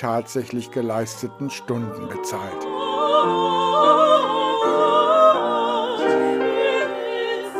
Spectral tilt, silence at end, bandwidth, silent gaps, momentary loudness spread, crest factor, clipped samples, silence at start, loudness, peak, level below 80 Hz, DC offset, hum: -4.5 dB/octave; 0 s; 15.5 kHz; none; 13 LU; 16 dB; under 0.1%; 0 s; -20 LUFS; -4 dBFS; -66 dBFS; under 0.1%; none